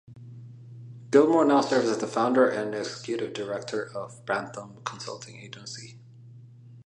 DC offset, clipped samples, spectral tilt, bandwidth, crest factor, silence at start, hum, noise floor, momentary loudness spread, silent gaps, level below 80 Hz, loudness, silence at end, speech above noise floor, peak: under 0.1%; under 0.1%; -5 dB/octave; 10.5 kHz; 22 dB; 0.1 s; none; -48 dBFS; 25 LU; none; -74 dBFS; -26 LUFS; 0.05 s; 22 dB; -6 dBFS